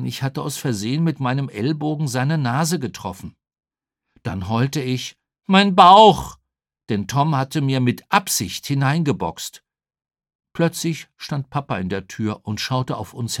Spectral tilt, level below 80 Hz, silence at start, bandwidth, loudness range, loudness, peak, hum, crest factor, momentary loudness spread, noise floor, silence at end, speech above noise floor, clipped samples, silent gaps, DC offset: -5 dB/octave; -54 dBFS; 0 s; 18 kHz; 9 LU; -19 LUFS; 0 dBFS; none; 20 dB; 15 LU; -80 dBFS; 0 s; 61 dB; under 0.1%; 10.35-10.39 s; under 0.1%